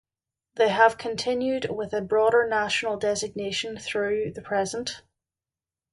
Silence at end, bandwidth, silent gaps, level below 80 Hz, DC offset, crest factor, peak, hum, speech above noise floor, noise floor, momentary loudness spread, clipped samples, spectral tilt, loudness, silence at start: 0.95 s; 11.5 kHz; none; -62 dBFS; under 0.1%; 20 dB; -6 dBFS; none; over 65 dB; under -90 dBFS; 9 LU; under 0.1%; -3.5 dB/octave; -25 LUFS; 0.55 s